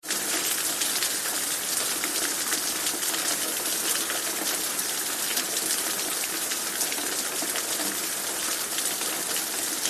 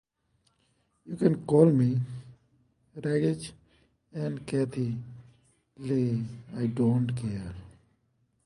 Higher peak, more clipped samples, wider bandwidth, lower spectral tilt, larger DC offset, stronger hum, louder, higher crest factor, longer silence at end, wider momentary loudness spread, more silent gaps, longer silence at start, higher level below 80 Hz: about the same, -6 dBFS vs -6 dBFS; neither; first, 14.5 kHz vs 11.5 kHz; second, 0.5 dB/octave vs -8.5 dB/octave; neither; neither; first, -25 LUFS vs -28 LUFS; about the same, 22 dB vs 22 dB; second, 0 s vs 0.75 s; second, 2 LU vs 21 LU; neither; second, 0.05 s vs 1.05 s; second, -68 dBFS vs -60 dBFS